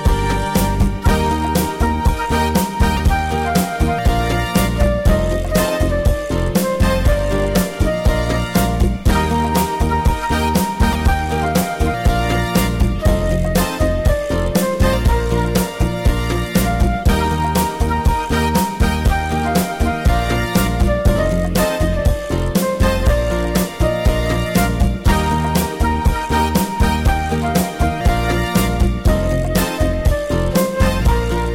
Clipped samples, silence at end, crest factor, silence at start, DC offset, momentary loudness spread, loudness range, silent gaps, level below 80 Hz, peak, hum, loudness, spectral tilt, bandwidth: under 0.1%; 0 s; 14 dB; 0 s; under 0.1%; 2 LU; 0 LU; none; -20 dBFS; -2 dBFS; none; -17 LUFS; -5.5 dB/octave; 17 kHz